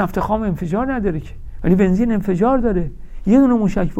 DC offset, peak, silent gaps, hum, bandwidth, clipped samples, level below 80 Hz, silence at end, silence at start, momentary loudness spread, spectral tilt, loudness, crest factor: under 0.1%; -2 dBFS; none; none; 14 kHz; under 0.1%; -30 dBFS; 0 s; 0 s; 11 LU; -9 dB/octave; -17 LUFS; 14 dB